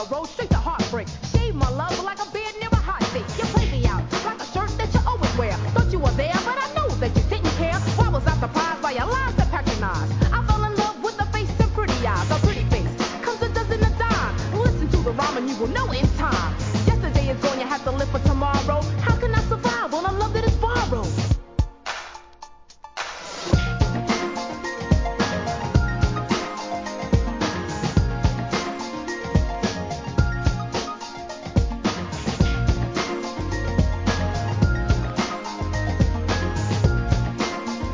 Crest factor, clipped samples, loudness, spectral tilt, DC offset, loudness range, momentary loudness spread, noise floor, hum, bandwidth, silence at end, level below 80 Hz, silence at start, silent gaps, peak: 18 dB; under 0.1%; -23 LUFS; -6 dB/octave; 0.2%; 3 LU; 7 LU; -45 dBFS; none; 7.6 kHz; 0 s; -28 dBFS; 0 s; none; -4 dBFS